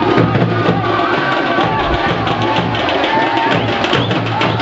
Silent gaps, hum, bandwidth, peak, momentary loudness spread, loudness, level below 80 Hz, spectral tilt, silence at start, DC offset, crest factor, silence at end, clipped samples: none; none; 7.8 kHz; 0 dBFS; 2 LU; -14 LUFS; -36 dBFS; -6.5 dB/octave; 0 s; under 0.1%; 14 dB; 0 s; under 0.1%